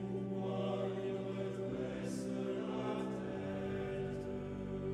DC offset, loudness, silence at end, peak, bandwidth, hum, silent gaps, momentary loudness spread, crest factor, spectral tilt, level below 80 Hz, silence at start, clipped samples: under 0.1%; -40 LUFS; 0 s; -26 dBFS; 12 kHz; none; none; 3 LU; 14 dB; -7 dB/octave; -60 dBFS; 0 s; under 0.1%